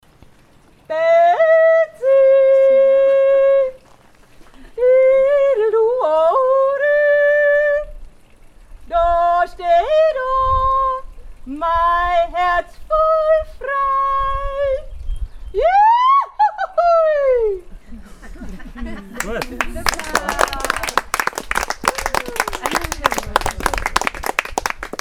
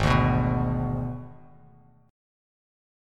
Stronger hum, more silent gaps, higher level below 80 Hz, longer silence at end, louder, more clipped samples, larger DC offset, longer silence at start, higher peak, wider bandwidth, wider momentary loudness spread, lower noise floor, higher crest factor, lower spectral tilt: neither; neither; about the same, -34 dBFS vs -38 dBFS; second, 0.05 s vs 1.75 s; first, -16 LUFS vs -26 LUFS; neither; neither; first, 0.9 s vs 0 s; first, 0 dBFS vs -8 dBFS; first, 19.5 kHz vs 10 kHz; second, 12 LU vs 17 LU; second, -49 dBFS vs -55 dBFS; about the same, 16 dB vs 20 dB; second, -3 dB/octave vs -7.5 dB/octave